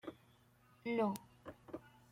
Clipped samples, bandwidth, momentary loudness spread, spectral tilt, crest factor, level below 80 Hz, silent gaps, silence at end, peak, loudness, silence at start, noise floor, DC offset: under 0.1%; 16.5 kHz; 18 LU; -6.5 dB/octave; 22 dB; -78 dBFS; none; 0.2 s; -22 dBFS; -42 LUFS; 0.05 s; -69 dBFS; under 0.1%